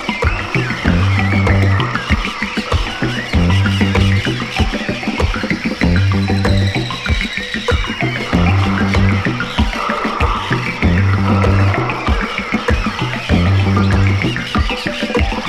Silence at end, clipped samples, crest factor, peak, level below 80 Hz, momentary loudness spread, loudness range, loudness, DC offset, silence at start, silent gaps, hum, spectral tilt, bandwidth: 0 s; under 0.1%; 14 dB; 0 dBFS; -24 dBFS; 5 LU; 1 LU; -16 LUFS; under 0.1%; 0 s; none; none; -6 dB/octave; 11 kHz